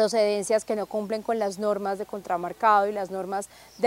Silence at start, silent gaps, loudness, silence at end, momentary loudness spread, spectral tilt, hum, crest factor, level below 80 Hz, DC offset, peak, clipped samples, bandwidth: 0 s; none; -26 LUFS; 0 s; 11 LU; -4 dB/octave; none; 18 dB; -66 dBFS; under 0.1%; -8 dBFS; under 0.1%; 16 kHz